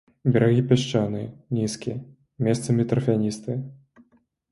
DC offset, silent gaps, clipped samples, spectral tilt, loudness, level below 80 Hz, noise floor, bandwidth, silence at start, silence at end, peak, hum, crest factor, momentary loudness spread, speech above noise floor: under 0.1%; none; under 0.1%; -7 dB/octave; -24 LUFS; -56 dBFS; -63 dBFS; 11.5 kHz; 0.25 s; 0.75 s; -4 dBFS; none; 20 dB; 13 LU; 40 dB